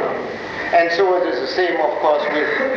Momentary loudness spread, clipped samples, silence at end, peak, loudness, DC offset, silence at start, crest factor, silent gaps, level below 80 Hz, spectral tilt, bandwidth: 9 LU; under 0.1%; 0 s; -4 dBFS; -18 LUFS; under 0.1%; 0 s; 14 dB; none; -56 dBFS; -4.5 dB/octave; 7.2 kHz